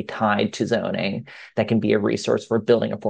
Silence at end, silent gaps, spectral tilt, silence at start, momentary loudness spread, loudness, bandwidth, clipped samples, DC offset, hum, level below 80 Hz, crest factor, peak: 0 s; none; -6 dB/octave; 0 s; 7 LU; -22 LUFS; 9.2 kHz; under 0.1%; under 0.1%; none; -64 dBFS; 16 dB; -6 dBFS